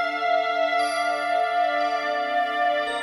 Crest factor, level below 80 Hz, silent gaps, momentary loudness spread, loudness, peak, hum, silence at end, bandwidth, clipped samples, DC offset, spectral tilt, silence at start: 10 dB; -70 dBFS; none; 2 LU; -23 LUFS; -12 dBFS; none; 0 s; 11.5 kHz; under 0.1%; under 0.1%; -1.5 dB/octave; 0 s